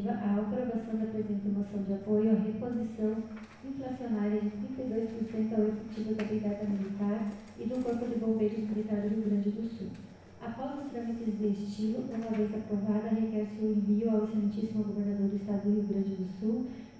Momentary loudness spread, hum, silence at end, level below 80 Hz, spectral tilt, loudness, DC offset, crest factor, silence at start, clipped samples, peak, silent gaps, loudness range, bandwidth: 9 LU; none; 0 s; -62 dBFS; -9 dB/octave; -33 LUFS; under 0.1%; 16 dB; 0 s; under 0.1%; -16 dBFS; none; 3 LU; 8 kHz